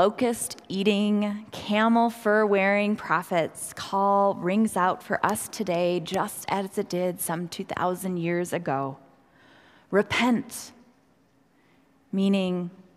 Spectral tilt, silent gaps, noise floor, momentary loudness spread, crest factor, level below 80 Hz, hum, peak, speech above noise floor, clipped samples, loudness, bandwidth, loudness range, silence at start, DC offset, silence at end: -5 dB/octave; none; -63 dBFS; 9 LU; 20 dB; -66 dBFS; none; -6 dBFS; 38 dB; under 0.1%; -26 LUFS; 16 kHz; 6 LU; 0 s; under 0.1%; 0.15 s